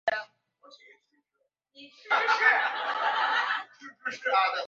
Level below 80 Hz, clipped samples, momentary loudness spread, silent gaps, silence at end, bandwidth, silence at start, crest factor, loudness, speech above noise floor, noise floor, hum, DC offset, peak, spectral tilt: -84 dBFS; under 0.1%; 14 LU; none; 0 s; 7.8 kHz; 0.05 s; 20 dB; -26 LUFS; 52 dB; -79 dBFS; none; under 0.1%; -8 dBFS; -0.5 dB/octave